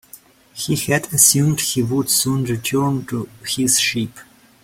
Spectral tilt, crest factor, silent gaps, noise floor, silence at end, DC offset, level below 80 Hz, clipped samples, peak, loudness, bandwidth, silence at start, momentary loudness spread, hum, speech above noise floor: -3.5 dB/octave; 20 dB; none; -46 dBFS; 0.4 s; under 0.1%; -52 dBFS; under 0.1%; 0 dBFS; -17 LUFS; 16.5 kHz; 0.15 s; 15 LU; none; 27 dB